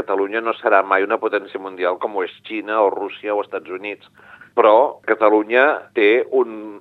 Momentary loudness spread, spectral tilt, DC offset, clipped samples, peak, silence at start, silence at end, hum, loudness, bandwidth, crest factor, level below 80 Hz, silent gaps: 13 LU; -6 dB/octave; under 0.1%; under 0.1%; 0 dBFS; 0 s; 0 s; none; -18 LUFS; 4.5 kHz; 18 dB; -78 dBFS; none